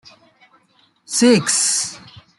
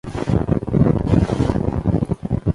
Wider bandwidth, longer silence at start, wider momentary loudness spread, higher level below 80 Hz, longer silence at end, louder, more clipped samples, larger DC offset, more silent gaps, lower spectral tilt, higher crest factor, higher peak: about the same, 12 kHz vs 11.5 kHz; first, 1.1 s vs 0.05 s; first, 10 LU vs 5 LU; second, -64 dBFS vs -30 dBFS; first, 0.4 s vs 0 s; first, -16 LUFS vs -19 LUFS; neither; neither; neither; second, -2.5 dB/octave vs -9 dB/octave; about the same, 18 dB vs 16 dB; about the same, -2 dBFS vs -2 dBFS